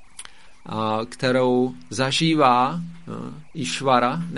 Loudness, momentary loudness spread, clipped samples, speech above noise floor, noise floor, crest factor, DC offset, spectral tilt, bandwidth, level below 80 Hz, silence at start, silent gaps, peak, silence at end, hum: -21 LUFS; 17 LU; under 0.1%; 22 dB; -44 dBFS; 20 dB; 0.7%; -5 dB/octave; 11.5 kHz; -56 dBFS; 0.2 s; none; -4 dBFS; 0 s; none